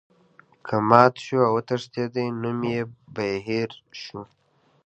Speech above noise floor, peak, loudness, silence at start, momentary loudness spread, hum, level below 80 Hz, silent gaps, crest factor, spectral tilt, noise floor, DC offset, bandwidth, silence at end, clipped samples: 34 dB; 0 dBFS; -23 LUFS; 0.65 s; 21 LU; none; -64 dBFS; none; 24 dB; -7 dB/octave; -57 dBFS; under 0.1%; 8.8 kHz; 0.6 s; under 0.1%